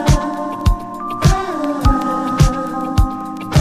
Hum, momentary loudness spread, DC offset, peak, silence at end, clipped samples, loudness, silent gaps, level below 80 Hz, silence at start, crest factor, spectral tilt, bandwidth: none; 7 LU; under 0.1%; 0 dBFS; 0 s; under 0.1%; -18 LUFS; none; -20 dBFS; 0 s; 16 dB; -6 dB/octave; 15.5 kHz